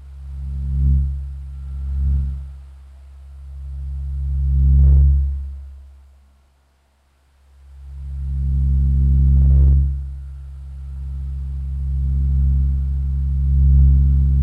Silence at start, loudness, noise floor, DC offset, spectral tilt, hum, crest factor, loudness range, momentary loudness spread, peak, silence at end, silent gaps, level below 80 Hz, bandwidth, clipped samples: 0 s; -19 LUFS; -59 dBFS; under 0.1%; -11 dB/octave; none; 14 dB; 8 LU; 21 LU; -4 dBFS; 0 s; none; -18 dBFS; 0.9 kHz; under 0.1%